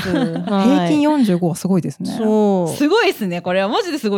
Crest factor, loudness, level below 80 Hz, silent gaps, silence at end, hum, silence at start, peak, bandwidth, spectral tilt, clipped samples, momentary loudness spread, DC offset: 12 dB; -17 LUFS; -58 dBFS; none; 0 s; none; 0 s; -4 dBFS; 18 kHz; -6 dB/octave; under 0.1%; 5 LU; under 0.1%